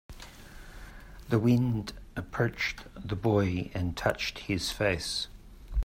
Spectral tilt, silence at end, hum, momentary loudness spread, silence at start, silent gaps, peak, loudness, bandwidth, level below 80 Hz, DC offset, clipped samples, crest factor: -5.5 dB/octave; 0 s; none; 22 LU; 0.1 s; none; -12 dBFS; -30 LUFS; 16 kHz; -46 dBFS; under 0.1%; under 0.1%; 18 dB